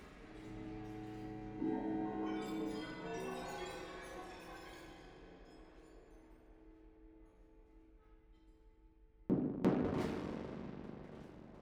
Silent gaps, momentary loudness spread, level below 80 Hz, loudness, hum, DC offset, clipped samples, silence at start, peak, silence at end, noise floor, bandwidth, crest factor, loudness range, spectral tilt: none; 25 LU; -62 dBFS; -43 LUFS; none; under 0.1%; under 0.1%; 0 s; -20 dBFS; 0 s; -65 dBFS; 17.5 kHz; 24 dB; 21 LU; -7 dB/octave